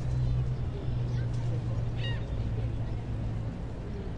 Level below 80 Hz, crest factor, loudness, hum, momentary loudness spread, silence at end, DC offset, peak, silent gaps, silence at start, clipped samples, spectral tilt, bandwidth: -38 dBFS; 12 dB; -33 LUFS; none; 6 LU; 0 s; under 0.1%; -18 dBFS; none; 0 s; under 0.1%; -8 dB/octave; 7.6 kHz